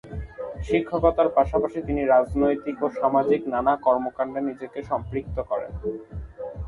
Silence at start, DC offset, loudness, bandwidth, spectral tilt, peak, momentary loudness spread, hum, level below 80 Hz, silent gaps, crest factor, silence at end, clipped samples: 0.05 s; under 0.1%; -24 LUFS; 10.5 kHz; -8.5 dB/octave; -6 dBFS; 15 LU; none; -40 dBFS; none; 18 dB; 0 s; under 0.1%